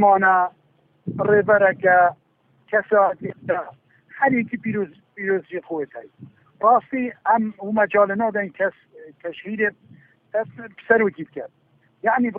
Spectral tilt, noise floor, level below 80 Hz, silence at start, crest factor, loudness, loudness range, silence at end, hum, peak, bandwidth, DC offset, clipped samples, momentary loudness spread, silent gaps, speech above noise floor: -10 dB/octave; -58 dBFS; -66 dBFS; 0 s; 18 dB; -21 LUFS; 6 LU; 0 s; none; -4 dBFS; 3.7 kHz; under 0.1%; under 0.1%; 18 LU; none; 38 dB